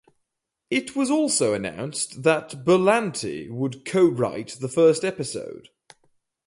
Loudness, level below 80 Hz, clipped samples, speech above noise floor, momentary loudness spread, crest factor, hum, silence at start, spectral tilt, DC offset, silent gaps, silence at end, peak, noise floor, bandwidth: -23 LUFS; -64 dBFS; under 0.1%; 57 dB; 12 LU; 18 dB; none; 0.7 s; -4.5 dB/octave; under 0.1%; none; 0.9 s; -4 dBFS; -80 dBFS; 11.5 kHz